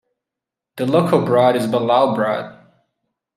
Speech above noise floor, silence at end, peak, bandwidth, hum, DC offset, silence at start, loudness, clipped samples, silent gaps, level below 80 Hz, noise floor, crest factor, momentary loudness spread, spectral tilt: 69 dB; 0.85 s; -2 dBFS; 14.5 kHz; none; under 0.1%; 0.75 s; -17 LUFS; under 0.1%; none; -66 dBFS; -85 dBFS; 16 dB; 10 LU; -7 dB/octave